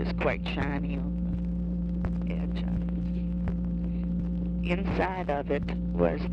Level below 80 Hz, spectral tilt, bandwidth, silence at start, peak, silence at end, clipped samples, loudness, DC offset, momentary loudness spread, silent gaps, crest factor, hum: -36 dBFS; -9 dB/octave; 5.6 kHz; 0 s; -10 dBFS; 0 s; under 0.1%; -30 LUFS; under 0.1%; 4 LU; none; 18 dB; none